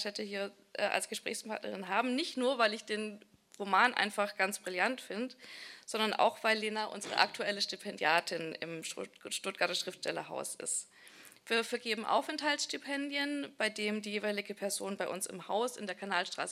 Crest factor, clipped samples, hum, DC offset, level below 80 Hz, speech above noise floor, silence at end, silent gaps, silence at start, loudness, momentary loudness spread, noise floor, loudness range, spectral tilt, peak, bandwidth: 26 dB; under 0.1%; none; under 0.1%; under -90 dBFS; 22 dB; 0 s; none; 0 s; -34 LUFS; 10 LU; -57 dBFS; 3 LU; -2 dB/octave; -8 dBFS; 16 kHz